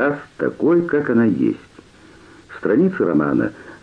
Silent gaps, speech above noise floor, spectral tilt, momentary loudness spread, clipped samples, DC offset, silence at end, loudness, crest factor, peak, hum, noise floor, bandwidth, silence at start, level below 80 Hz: none; 28 dB; -9.5 dB/octave; 10 LU; under 0.1%; under 0.1%; 0.05 s; -18 LUFS; 12 dB; -6 dBFS; none; -46 dBFS; 7.2 kHz; 0 s; -56 dBFS